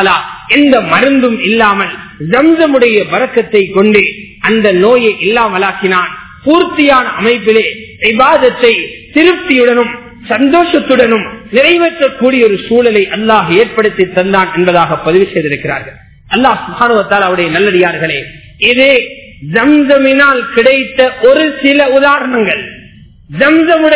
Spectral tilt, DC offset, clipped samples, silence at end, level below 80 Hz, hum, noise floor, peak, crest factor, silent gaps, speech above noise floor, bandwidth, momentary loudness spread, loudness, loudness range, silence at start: -9 dB/octave; under 0.1%; 3%; 0 s; -42 dBFS; none; -36 dBFS; 0 dBFS; 10 dB; none; 28 dB; 4 kHz; 7 LU; -9 LUFS; 3 LU; 0 s